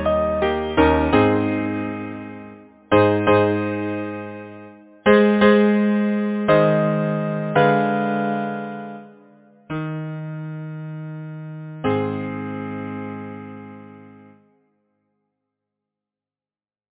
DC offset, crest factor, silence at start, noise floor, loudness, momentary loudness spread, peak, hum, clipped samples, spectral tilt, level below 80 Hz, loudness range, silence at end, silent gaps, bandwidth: under 0.1%; 20 dB; 0 s; under -90 dBFS; -20 LUFS; 18 LU; -2 dBFS; none; under 0.1%; -11 dB/octave; -42 dBFS; 14 LU; 2.8 s; none; 4 kHz